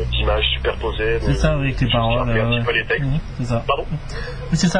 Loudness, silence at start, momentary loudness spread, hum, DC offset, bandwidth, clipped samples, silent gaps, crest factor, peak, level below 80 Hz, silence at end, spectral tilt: -20 LUFS; 0 s; 6 LU; none; under 0.1%; 10.5 kHz; under 0.1%; none; 14 dB; -4 dBFS; -26 dBFS; 0 s; -5.5 dB/octave